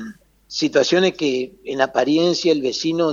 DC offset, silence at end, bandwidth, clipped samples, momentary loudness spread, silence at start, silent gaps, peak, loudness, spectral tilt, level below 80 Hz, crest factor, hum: under 0.1%; 0 s; 7.6 kHz; under 0.1%; 10 LU; 0 s; none; -2 dBFS; -19 LUFS; -4.5 dB/octave; -60 dBFS; 18 dB; none